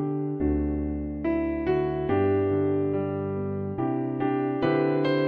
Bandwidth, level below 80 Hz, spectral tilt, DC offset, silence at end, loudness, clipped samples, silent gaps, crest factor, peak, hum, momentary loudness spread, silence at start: 5.2 kHz; -42 dBFS; -10.5 dB/octave; under 0.1%; 0 s; -26 LUFS; under 0.1%; none; 14 dB; -10 dBFS; none; 6 LU; 0 s